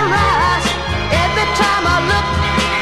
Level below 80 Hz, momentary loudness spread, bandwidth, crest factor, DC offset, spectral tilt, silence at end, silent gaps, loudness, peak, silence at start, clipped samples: -26 dBFS; 3 LU; 13 kHz; 14 dB; 0.5%; -4 dB/octave; 0 s; none; -15 LUFS; -2 dBFS; 0 s; under 0.1%